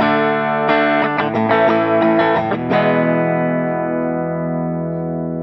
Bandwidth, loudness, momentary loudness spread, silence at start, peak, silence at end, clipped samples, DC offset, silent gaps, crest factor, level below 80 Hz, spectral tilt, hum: 6 kHz; -16 LUFS; 7 LU; 0 s; -2 dBFS; 0 s; under 0.1%; under 0.1%; none; 14 dB; -54 dBFS; -9 dB/octave; none